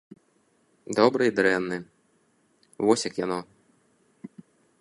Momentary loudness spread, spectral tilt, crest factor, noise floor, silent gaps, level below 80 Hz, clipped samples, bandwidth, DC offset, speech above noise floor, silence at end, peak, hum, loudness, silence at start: 25 LU; -4.5 dB/octave; 24 dB; -67 dBFS; none; -68 dBFS; under 0.1%; 11.5 kHz; under 0.1%; 43 dB; 0.55 s; -4 dBFS; none; -25 LUFS; 0.9 s